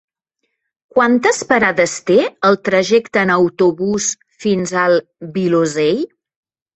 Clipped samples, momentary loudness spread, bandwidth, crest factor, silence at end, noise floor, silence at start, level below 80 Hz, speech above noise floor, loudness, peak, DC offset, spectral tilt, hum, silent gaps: under 0.1%; 7 LU; 8.4 kHz; 16 dB; 0.7 s; -73 dBFS; 0.95 s; -56 dBFS; 58 dB; -15 LUFS; 0 dBFS; under 0.1%; -4.5 dB/octave; none; none